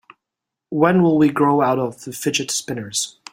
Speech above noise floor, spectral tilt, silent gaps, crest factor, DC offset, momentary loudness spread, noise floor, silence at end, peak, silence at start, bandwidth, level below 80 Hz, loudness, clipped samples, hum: 66 dB; -4.5 dB/octave; none; 18 dB; under 0.1%; 10 LU; -84 dBFS; 0.2 s; -2 dBFS; 0.7 s; 16.5 kHz; -60 dBFS; -19 LUFS; under 0.1%; none